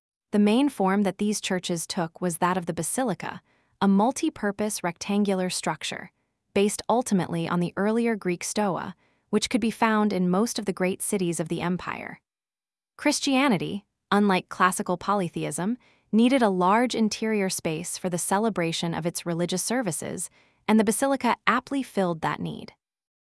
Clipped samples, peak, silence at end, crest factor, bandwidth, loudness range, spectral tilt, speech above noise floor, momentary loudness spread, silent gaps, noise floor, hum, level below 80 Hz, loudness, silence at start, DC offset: under 0.1%; -2 dBFS; 0.6 s; 22 dB; 12 kHz; 3 LU; -4.5 dB/octave; over 65 dB; 9 LU; none; under -90 dBFS; none; -64 dBFS; -25 LUFS; 0.35 s; under 0.1%